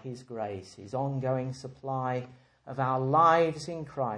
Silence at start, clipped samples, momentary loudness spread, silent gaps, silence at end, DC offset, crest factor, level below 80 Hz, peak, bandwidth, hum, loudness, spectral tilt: 0.05 s; under 0.1%; 18 LU; none; 0 s; under 0.1%; 20 dB; -68 dBFS; -10 dBFS; 10 kHz; none; -29 LUFS; -7 dB/octave